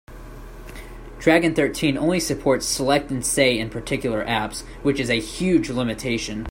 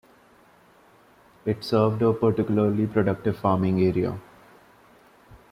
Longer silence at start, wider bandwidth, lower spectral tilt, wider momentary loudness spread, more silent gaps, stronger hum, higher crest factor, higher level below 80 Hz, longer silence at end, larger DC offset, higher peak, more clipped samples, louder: second, 0.1 s vs 1.45 s; first, 16.5 kHz vs 14.5 kHz; second, -4 dB/octave vs -9 dB/octave; first, 21 LU vs 8 LU; neither; neither; about the same, 20 dB vs 18 dB; first, -40 dBFS vs -58 dBFS; second, 0 s vs 0.15 s; neither; first, -2 dBFS vs -8 dBFS; neither; first, -21 LUFS vs -24 LUFS